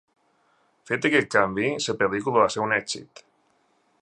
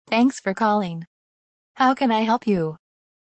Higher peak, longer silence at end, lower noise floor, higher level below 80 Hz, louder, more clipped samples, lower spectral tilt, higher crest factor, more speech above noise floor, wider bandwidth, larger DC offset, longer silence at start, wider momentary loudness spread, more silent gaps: about the same, -4 dBFS vs -6 dBFS; first, 0.95 s vs 0.5 s; second, -66 dBFS vs under -90 dBFS; about the same, -62 dBFS vs -62 dBFS; about the same, -23 LUFS vs -21 LUFS; neither; second, -4 dB/octave vs -6 dB/octave; first, 22 dB vs 16 dB; second, 43 dB vs over 70 dB; first, 11 kHz vs 8.8 kHz; neither; first, 0.9 s vs 0.1 s; about the same, 8 LU vs 10 LU; second, none vs 1.07-1.75 s